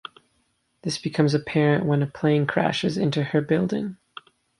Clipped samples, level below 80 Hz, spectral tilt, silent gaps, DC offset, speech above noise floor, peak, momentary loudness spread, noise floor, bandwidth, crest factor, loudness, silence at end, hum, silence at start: under 0.1%; -60 dBFS; -6.5 dB/octave; none; under 0.1%; 47 dB; -6 dBFS; 16 LU; -69 dBFS; 11.5 kHz; 18 dB; -23 LUFS; 0.65 s; none; 0.85 s